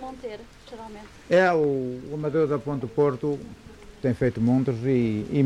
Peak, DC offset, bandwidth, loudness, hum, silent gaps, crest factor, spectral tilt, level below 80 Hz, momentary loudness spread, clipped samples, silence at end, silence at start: -8 dBFS; under 0.1%; 11 kHz; -24 LUFS; none; none; 16 dB; -8 dB/octave; -52 dBFS; 21 LU; under 0.1%; 0 s; 0 s